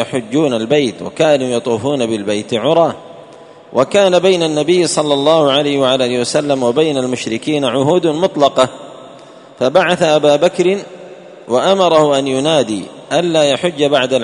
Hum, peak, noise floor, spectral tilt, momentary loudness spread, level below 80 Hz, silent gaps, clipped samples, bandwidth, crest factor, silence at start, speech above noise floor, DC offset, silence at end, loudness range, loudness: none; 0 dBFS; -38 dBFS; -4.5 dB/octave; 8 LU; -56 dBFS; none; under 0.1%; 11 kHz; 14 dB; 0 s; 25 dB; under 0.1%; 0 s; 2 LU; -13 LUFS